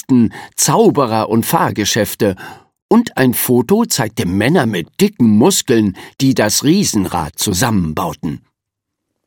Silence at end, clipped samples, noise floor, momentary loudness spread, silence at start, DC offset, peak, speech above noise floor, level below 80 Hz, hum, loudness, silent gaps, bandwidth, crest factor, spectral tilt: 0.9 s; under 0.1%; -78 dBFS; 8 LU; 0.1 s; under 0.1%; 0 dBFS; 64 dB; -46 dBFS; none; -14 LUFS; 2.82-2.89 s; 17.5 kHz; 14 dB; -4.5 dB/octave